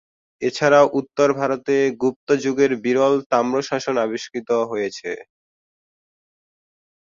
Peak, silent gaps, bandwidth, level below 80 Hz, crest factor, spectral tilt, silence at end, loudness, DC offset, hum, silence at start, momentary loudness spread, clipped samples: -2 dBFS; 2.16-2.27 s, 3.26-3.30 s; 7.6 kHz; -64 dBFS; 18 dB; -5 dB/octave; 1.9 s; -20 LUFS; under 0.1%; none; 0.4 s; 11 LU; under 0.1%